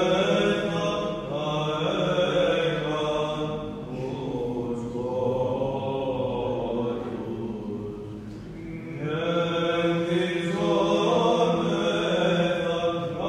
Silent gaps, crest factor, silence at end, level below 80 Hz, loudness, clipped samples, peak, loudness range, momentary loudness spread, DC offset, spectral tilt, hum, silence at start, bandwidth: none; 16 dB; 0 s; -52 dBFS; -26 LUFS; under 0.1%; -10 dBFS; 6 LU; 11 LU; under 0.1%; -6 dB/octave; none; 0 s; 11 kHz